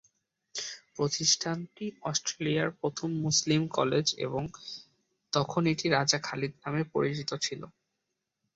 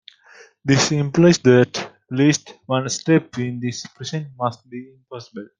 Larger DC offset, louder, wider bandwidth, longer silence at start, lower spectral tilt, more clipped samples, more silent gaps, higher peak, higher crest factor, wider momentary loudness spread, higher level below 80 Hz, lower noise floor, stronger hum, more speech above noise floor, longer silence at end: neither; second, -30 LUFS vs -19 LUFS; second, 8 kHz vs 10 kHz; about the same, 0.55 s vs 0.65 s; second, -3.5 dB/octave vs -5 dB/octave; neither; neither; second, -10 dBFS vs -2 dBFS; about the same, 22 dB vs 18 dB; second, 14 LU vs 21 LU; second, -68 dBFS vs -56 dBFS; first, -84 dBFS vs -49 dBFS; neither; first, 54 dB vs 30 dB; first, 0.85 s vs 0.15 s